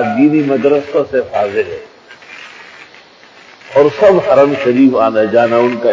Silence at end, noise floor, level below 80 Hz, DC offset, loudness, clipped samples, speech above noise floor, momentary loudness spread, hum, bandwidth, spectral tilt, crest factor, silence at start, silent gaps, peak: 0 s; -41 dBFS; -52 dBFS; under 0.1%; -11 LUFS; under 0.1%; 30 dB; 21 LU; none; 7.6 kHz; -7 dB/octave; 12 dB; 0 s; none; 0 dBFS